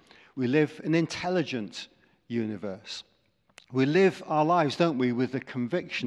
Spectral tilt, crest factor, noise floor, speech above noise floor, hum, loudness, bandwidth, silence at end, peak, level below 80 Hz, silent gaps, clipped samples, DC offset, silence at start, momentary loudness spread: -6.5 dB/octave; 20 dB; -59 dBFS; 32 dB; none; -27 LUFS; 11 kHz; 0 s; -8 dBFS; -72 dBFS; none; under 0.1%; under 0.1%; 0.35 s; 15 LU